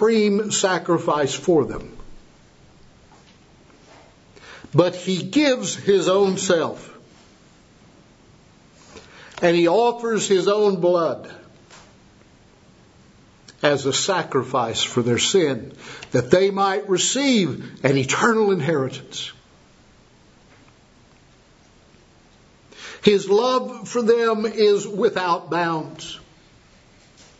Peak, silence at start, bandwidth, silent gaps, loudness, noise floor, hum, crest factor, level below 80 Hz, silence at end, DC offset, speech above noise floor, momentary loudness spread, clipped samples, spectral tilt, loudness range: 0 dBFS; 0 s; 8 kHz; none; -20 LUFS; -53 dBFS; none; 22 dB; -56 dBFS; 1.2 s; under 0.1%; 33 dB; 14 LU; under 0.1%; -4 dB/octave; 8 LU